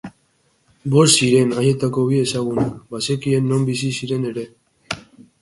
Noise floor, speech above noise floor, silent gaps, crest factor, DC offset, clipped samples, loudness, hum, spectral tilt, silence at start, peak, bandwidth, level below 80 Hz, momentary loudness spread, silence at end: -62 dBFS; 44 dB; none; 18 dB; under 0.1%; under 0.1%; -18 LUFS; none; -5 dB/octave; 0.05 s; -2 dBFS; 11.5 kHz; -54 dBFS; 18 LU; 0.4 s